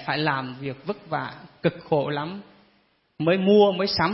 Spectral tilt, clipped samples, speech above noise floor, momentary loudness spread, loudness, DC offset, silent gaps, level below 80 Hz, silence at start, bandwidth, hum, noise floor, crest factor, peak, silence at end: -9 dB/octave; under 0.1%; 41 dB; 16 LU; -24 LUFS; under 0.1%; none; -58 dBFS; 0 s; 6 kHz; none; -65 dBFS; 18 dB; -6 dBFS; 0 s